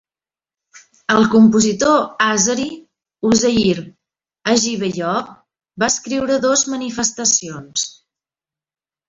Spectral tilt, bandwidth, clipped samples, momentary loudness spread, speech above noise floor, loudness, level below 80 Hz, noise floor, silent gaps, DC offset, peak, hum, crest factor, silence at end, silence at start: -3 dB/octave; 7.8 kHz; under 0.1%; 11 LU; over 74 dB; -16 LUFS; -52 dBFS; under -90 dBFS; none; under 0.1%; 0 dBFS; none; 18 dB; 1.2 s; 0.75 s